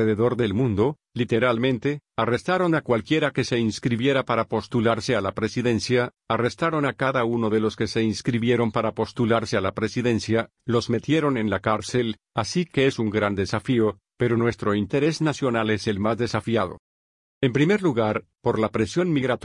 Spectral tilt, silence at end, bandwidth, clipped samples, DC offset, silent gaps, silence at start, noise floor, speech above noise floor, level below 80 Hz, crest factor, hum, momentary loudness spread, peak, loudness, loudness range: -6 dB/octave; 0.05 s; 11 kHz; under 0.1%; under 0.1%; 16.79-17.41 s; 0 s; under -90 dBFS; over 67 dB; -56 dBFS; 16 dB; none; 4 LU; -8 dBFS; -23 LUFS; 1 LU